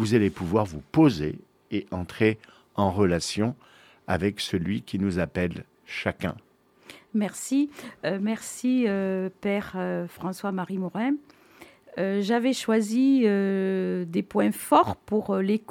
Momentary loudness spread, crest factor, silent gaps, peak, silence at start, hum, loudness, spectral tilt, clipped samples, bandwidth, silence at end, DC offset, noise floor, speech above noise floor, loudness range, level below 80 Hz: 12 LU; 20 dB; none; -6 dBFS; 0 s; none; -26 LUFS; -6 dB/octave; under 0.1%; 17 kHz; 0.1 s; under 0.1%; -52 dBFS; 27 dB; 6 LU; -56 dBFS